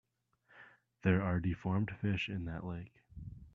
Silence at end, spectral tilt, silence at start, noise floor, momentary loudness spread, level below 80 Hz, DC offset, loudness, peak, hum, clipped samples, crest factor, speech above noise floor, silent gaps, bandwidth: 0.05 s; -8.5 dB/octave; 0.55 s; -73 dBFS; 19 LU; -58 dBFS; under 0.1%; -36 LUFS; -16 dBFS; none; under 0.1%; 22 dB; 38 dB; none; 6.8 kHz